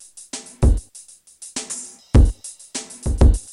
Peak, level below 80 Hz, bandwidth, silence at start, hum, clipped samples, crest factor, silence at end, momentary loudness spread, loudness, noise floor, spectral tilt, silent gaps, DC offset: -2 dBFS; -20 dBFS; 12 kHz; 0.35 s; none; under 0.1%; 16 dB; 0.1 s; 18 LU; -21 LUFS; -45 dBFS; -6 dB/octave; none; under 0.1%